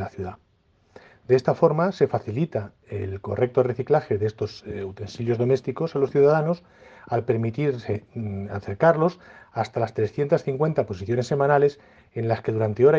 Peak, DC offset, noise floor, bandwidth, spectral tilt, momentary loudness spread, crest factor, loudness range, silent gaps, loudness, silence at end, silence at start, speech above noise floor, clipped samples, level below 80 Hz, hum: -4 dBFS; under 0.1%; -63 dBFS; 7.6 kHz; -8 dB/octave; 13 LU; 20 dB; 2 LU; none; -24 LUFS; 0 s; 0 s; 39 dB; under 0.1%; -62 dBFS; none